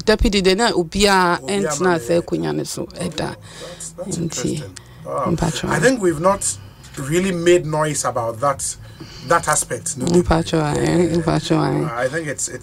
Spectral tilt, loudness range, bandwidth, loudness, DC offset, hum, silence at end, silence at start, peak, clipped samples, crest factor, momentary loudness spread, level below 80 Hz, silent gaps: -4.5 dB/octave; 5 LU; 16 kHz; -19 LUFS; under 0.1%; none; 0 s; 0 s; -2 dBFS; under 0.1%; 18 dB; 14 LU; -36 dBFS; none